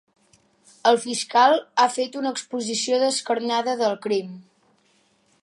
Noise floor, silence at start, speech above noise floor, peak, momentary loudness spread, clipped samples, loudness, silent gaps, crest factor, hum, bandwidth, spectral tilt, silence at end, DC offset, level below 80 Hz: -63 dBFS; 0.85 s; 41 dB; -4 dBFS; 9 LU; under 0.1%; -22 LUFS; none; 18 dB; none; 11.5 kHz; -2.5 dB/octave; 1 s; under 0.1%; -80 dBFS